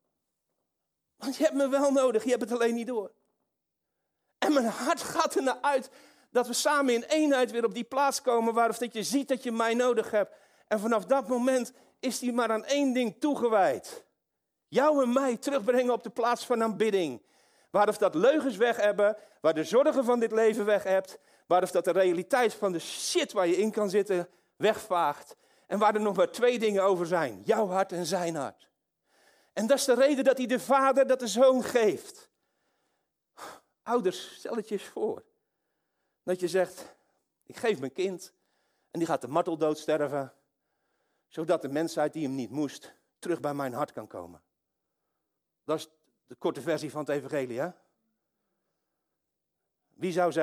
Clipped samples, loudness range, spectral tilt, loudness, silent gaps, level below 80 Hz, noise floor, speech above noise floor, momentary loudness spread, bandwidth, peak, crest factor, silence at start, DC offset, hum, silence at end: under 0.1%; 9 LU; -4 dB/octave; -28 LUFS; none; -80 dBFS; -84 dBFS; 57 dB; 12 LU; 16 kHz; -10 dBFS; 18 dB; 1.2 s; under 0.1%; none; 0 s